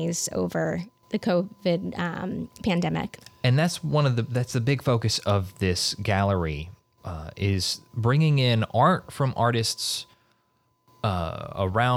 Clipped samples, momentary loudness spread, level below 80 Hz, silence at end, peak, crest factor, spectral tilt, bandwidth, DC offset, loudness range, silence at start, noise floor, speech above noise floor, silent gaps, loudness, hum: under 0.1%; 11 LU; -50 dBFS; 0 s; -8 dBFS; 16 dB; -5 dB/octave; 16 kHz; under 0.1%; 3 LU; 0 s; -69 dBFS; 44 dB; none; -25 LUFS; none